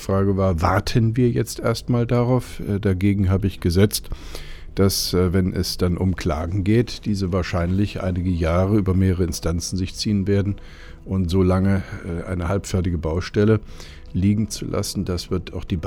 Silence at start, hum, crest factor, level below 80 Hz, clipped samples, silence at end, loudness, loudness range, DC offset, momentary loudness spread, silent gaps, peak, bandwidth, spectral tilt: 0 s; none; 18 dB; -34 dBFS; under 0.1%; 0 s; -21 LUFS; 2 LU; under 0.1%; 9 LU; none; -2 dBFS; 17.5 kHz; -6.5 dB/octave